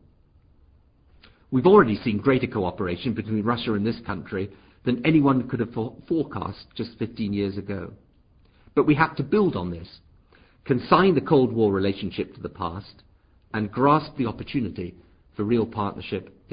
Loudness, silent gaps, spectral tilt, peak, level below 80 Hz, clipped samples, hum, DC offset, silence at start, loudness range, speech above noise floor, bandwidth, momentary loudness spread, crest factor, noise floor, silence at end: -24 LUFS; none; -11.5 dB/octave; -4 dBFS; -50 dBFS; under 0.1%; none; under 0.1%; 1.5 s; 5 LU; 34 dB; 5.2 kHz; 15 LU; 22 dB; -58 dBFS; 0.25 s